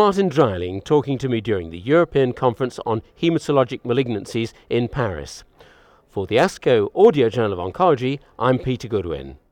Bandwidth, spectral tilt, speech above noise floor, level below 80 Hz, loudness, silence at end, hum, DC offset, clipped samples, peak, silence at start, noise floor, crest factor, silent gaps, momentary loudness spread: 11.5 kHz; -6.5 dB/octave; 32 dB; -48 dBFS; -20 LUFS; 0.15 s; none; under 0.1%; under 0.1%; -2 dBFS; 0 s; -52 dBFS; 16 dB; none; 10 LU